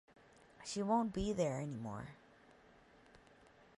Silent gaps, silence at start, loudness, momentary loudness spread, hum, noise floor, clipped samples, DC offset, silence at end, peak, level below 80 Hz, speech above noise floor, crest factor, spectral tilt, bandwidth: none; 0.6 s; -39 LUFS; 15 LU; none; -65 dBFS; under 0.1%; under 0.1%; 1.6 s; -22 dBFS; -60 dBFS; 27 dB; 20 dB; -6 dB/octave; 11.5 kHz